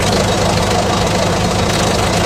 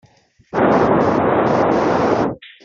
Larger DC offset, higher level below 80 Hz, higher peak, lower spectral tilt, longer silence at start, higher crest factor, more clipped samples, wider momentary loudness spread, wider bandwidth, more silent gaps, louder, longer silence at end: neither; first, -28 dBFS vs -46 dBFS; about the same, 0 dBFS vs -2 dBFS; second, -4 dB/octave vs -7.5 dB/octave; second, 0 s vs 0.55 s; about the same, 14 dB vs 14 dB; neither; second, 1 LU vs 6 LU; first, 15 kHz vs 7.6 kHz; neither; about the same, -14 LUFS vs -16 LUFS; second, 0 s vs 0.15 s